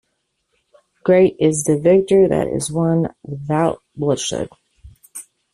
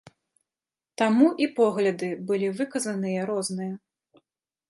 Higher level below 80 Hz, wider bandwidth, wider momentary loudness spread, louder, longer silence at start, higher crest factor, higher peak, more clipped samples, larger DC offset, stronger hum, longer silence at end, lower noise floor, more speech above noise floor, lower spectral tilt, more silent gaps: first, -50 dBFS vs -78 dBFS; first, 13 kHz vs 11.5 kHz; first, 18 LU vs 13 LU; first, -17 LUFS vs -25 LUFS; about the same, 1.05 s vs 1 s; about the same, 16 dB vs 20 dB; first, -2 dBFS vs -6 dBFS; neither; neither; neither; second, 0.3 s vs 0.9 s; second, -71 dBFS vs under -90 dBFS; second, 55 dB vs over 66 dB; about the same, -6 dB/octave vs -5.5 dB/octave; neither